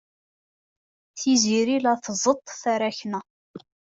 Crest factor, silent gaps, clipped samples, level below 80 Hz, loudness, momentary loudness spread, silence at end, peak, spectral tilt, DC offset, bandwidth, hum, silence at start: 18 dB; 3.30-3.54 s; under 0.1%; -70 dBFS; -23 LUFS; 13 LU; 0.25 s; -6 dBFS; -3 dB/octave; under 0.1%; 8 kHz; none; 1.15 s